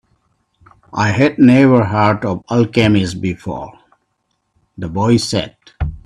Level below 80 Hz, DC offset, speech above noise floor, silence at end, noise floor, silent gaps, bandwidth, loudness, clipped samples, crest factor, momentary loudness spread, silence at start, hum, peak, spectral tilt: -38 dBFS; under 0.1%; 54 dB; 0.05 s; -68 dBFS; none; 11.5 kHz; -14 LUFS; under 0.1%; 16 dB; 17 LU; 0.95 s; none; 0 dBFS; -6.5 dB/octave